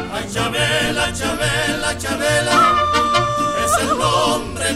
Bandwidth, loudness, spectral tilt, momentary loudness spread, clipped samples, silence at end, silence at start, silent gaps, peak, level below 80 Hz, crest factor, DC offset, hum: 16 kHz; -17 LUFS; -3 dB/octave; 7 LU; under 0.1%; 0 s; 0 s; none; -4 dBFS; -38 dBFS; 14 dB; 0.5%; none